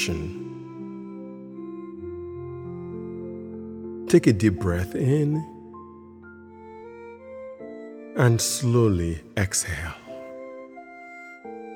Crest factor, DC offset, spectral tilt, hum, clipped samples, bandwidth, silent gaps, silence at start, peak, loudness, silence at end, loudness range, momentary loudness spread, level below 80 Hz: 22 dB; under 0.1%; -5.5 dB/octave; none; under 0.1%; 17 kHz; none; 0 s; -4 dBFS; -25 LUFS; 0 s; 12 LU; 22 LU; -48 dBFS